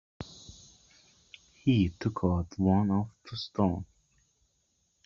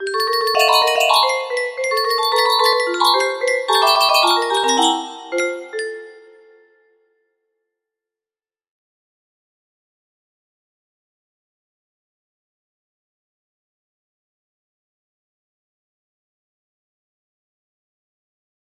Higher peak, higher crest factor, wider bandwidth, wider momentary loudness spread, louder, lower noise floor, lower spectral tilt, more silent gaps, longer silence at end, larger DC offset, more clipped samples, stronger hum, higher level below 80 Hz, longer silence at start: second, -12 dBFS vs 0 dBFS; about the same, 20 dB vs 22 dB; second, 7.2 kHz vs 16 kHz; first, 20 LU vs 11 LU; second, -30 LUFS vs -16 LUFS; second, -74 dBFS vs under -90 dBFS; first, -7 dB/octave vs 0.5 dB/octave; neither; second, 1.2 s vs 12.6 s; neither; neither; neither; first, -56 dBFS vs -72 dBFS; first, 0.2 s vs 0 s